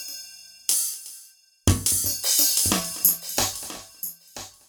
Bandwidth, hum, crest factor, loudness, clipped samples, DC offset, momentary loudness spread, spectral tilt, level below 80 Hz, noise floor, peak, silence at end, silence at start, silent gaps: over 20 kHz; none; 24 dB; -21 LUFS; under 0.1%; under 0.1%; 19 LU; -2 dB/octave; -44 dBFS; -51 dBFS; -2 dBFS; 0.2 s; 0 s; none